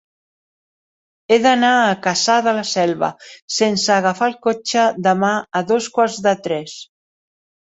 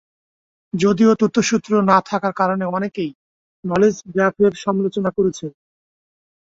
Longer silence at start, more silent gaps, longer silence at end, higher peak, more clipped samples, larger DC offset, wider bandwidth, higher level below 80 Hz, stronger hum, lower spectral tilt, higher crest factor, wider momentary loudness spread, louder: first, 1.3 s vs 0.75 s; second, 3.42-3.48 s vs 3.15-3.63 s; second, 0.9 s vs 1.05 s; about the same, -2 dBFS vs -2 dBFS; neither; neither; about the same, 8.2 kHz vs 7.8 kHz; second, -64 dBFS vs -58 dBFS; neither; second, -3.5 dB/octave vs -6 dB/octave; about the same, 16 dB vs 18 dB; second, 9 LU vs 13 LU; about the same, -17 LUFS vs -18 LUFS